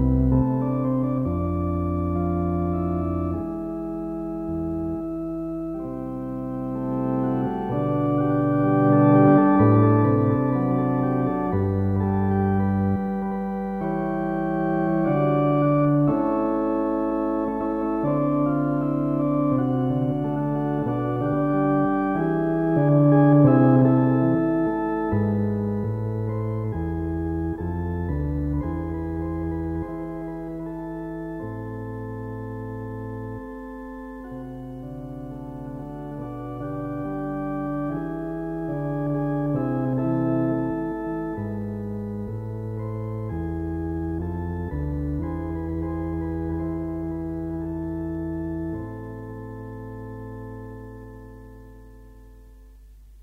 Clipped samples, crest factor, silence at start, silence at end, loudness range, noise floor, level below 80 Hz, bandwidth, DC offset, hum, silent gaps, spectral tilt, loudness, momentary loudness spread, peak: under 0.1%; 20 dB; 0 s; 0 s; 15 LU; -47 dBFS; -40 dBFS; 3.7 kHz; under 0.1%; none; none; -11.5 dB/octave; -24 LUFS; 15 LU; -4 dBFS